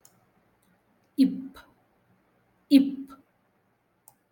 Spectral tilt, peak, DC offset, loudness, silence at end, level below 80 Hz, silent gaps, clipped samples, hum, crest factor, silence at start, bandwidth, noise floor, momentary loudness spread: -6 dB/octave; -6 dBFS; under 0.1%; -25 LUFS; 1.2 s; -74 dBFS; none; under 0.1%; 60 Hz at -60 dBFS; 22 dB; 1.2 s; 17.5 kHz; -70 dBFS; 22 LU